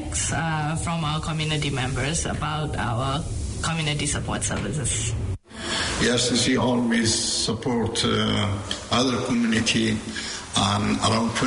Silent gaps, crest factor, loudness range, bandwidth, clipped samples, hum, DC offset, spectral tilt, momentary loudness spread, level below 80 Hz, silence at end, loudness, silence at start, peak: none; 14 dB; 4 LU; 11 kHz; under 0.1%; none; under 0.1%; -4 dB/octave; 7 LU; -40 dBFS; 0 s; -24 LUFS; 0 s; -10 dBFS